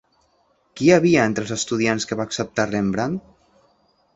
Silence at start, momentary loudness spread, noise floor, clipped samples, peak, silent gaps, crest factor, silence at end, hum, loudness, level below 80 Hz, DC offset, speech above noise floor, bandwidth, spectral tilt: 0.75 s; 10 LU; -63 dBFS; under 0.1%; -2 dBFS; none; 20 dB; 0.95 s; none; -20 LUFS; -54 dBFS; under 0.1%; 43 dB; 8.2 kHz; -5 dB/octave